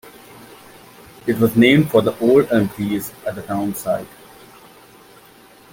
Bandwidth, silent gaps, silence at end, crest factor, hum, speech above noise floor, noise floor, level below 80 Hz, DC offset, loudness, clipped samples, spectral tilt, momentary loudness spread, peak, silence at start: 17 kHz; none; 1.65 s; 18 dB; none; 30 dB; -47 dBFS; -54 dBFS; under 0.1%; -18 LUFS; under 0.1%; -6 dB/octave; 15 LU; -2 dBFS; 0.05 s